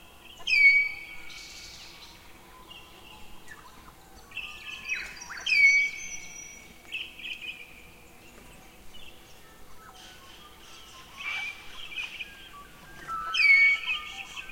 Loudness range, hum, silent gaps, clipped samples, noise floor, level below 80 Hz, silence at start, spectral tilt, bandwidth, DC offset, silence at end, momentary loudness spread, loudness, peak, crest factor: 20 LU; none; none; under 0.1%; -51 dBFS; -58 dBFS; 0.25 s; 0.5 dB/octave; 16.5 kHz; 0.1%; 0 s; 29 LU; -24 LUFS; -10 dBFS; 20 dB